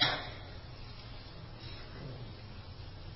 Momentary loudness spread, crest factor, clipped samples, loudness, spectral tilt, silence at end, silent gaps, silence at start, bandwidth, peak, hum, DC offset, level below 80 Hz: 8 LU; 28 dB; under 0.1%; -43 LUFS; -1.5 dB/octave; 0 s; none; 0 s; 5.8 kHz; -14 dBFS; none; under 0.1%; -52 dBFS